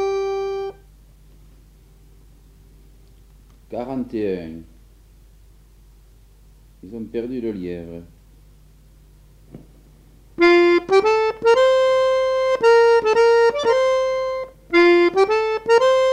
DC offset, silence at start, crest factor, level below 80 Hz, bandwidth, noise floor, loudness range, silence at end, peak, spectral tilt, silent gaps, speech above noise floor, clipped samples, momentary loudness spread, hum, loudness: under 0.1%; 0 s; 16 dB; -50 dBFS; 11 kHz; -49 dBFS; 18 LU; 0 s; -4 dBFS; -4.5 dB/octave; none; 22 dB; under 0.1%; 19 LU; none; -17 LUFS